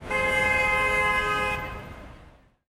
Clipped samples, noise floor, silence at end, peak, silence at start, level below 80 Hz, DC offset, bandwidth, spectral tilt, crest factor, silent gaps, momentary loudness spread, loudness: under 0.1%; -53 dBFS; 0.4 s; -12 dBFS; 0 s; -42 dBFS; under 0.1%; 17 kHz; -3.5 dB/octave; 16 dB; none; 16 LU; -23 LUFS